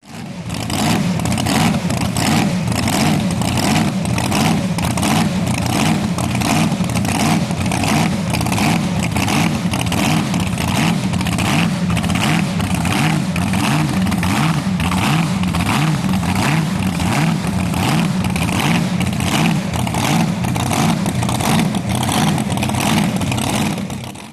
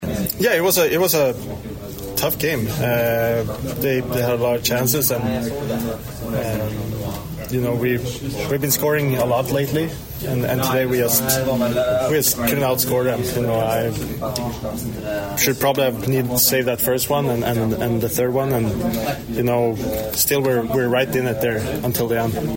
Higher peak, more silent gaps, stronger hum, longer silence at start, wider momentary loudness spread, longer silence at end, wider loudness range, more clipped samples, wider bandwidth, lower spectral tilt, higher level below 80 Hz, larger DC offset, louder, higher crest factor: about the same, -2 dBFS vs -4 dBFS; neither; neither; about the same, 0.05 s vs 0 s; second, 3 LU vs 9 LU; about the same, 0 s vs 0 s; about the same, 1 LU vs 3 LU; neither; second, 14.5 kHz vs 16.5 kHz; about the same, -5 dB/octave vs -4.5 dB/octave; about the same, -36 dBFS vs -40 dBFS; neither; first, -17 LUFS vs -20 LUFS; about the same, 14 dB vs 16 dB